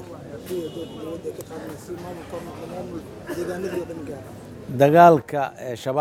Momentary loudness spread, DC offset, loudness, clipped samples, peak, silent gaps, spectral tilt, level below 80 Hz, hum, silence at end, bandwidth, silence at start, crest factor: 22 LU; under 0.1%; -21 LUFS; under 0.1%; 0 dBFS; none; -6.5 dB/octave; -56 dBFS; none; 0 s; 16.5 kHz; 0 s; 22 dB